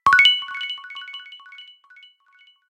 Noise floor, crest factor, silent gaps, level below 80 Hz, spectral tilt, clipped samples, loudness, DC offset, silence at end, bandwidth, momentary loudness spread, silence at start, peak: -56 dBFS; 20 dB; none; -62 dBFS; 0.5 dB/octave; under 0.1%; -17 LUFS; under 0.1%; 1.05 s; 16 kHz; 27 LU; 0.05 s; -2 dBFS